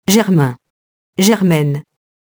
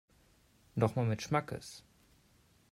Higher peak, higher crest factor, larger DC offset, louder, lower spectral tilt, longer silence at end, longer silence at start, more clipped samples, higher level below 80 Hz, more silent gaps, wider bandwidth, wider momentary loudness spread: first, 0 dBFS vs -14 dBFS; second, 16 dB vs 22 dB; neither; first, -14 LUFS vs -35 LUFS; about the same, -5.5 dB/octave vs -6.5 dB/octave; second, 0.55 s vs 0.9 s; second, 0.1 s vs 0.75 s; neither; first, -54 dBFS vs -66 dBFS; first, 0.70-1.13 s vs none; first, over 20 kHz vs 15 kHz; second, 11 LU vs 17 LU